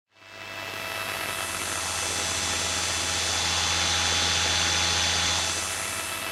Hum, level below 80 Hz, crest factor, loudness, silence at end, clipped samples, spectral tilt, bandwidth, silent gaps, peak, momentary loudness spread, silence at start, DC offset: 50 Hz at -50 dBFS; -48 dBFS; 18 dB; -24 LUFS; 0 s; under 0.1%; -0.5 dB/octave; 16 kHz; none; -10 dBFS; 9 LU; 0.2 s; under 0.1%